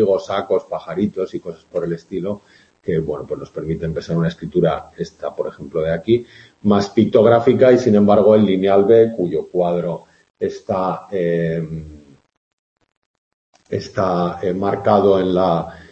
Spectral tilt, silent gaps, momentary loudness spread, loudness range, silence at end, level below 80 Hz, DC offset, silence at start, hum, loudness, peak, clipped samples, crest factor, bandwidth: -8 dB/octave; 10.30-10.34 s, 12.37-12.76 s, 12.97-13.53 s; 15 LU; 11 LU; 0.1 s; -48 dBFS; under 0.1%; 0 s; none; -18 LUFS; 0 dBFS; under 0.1%; 18 dB; 8 kHz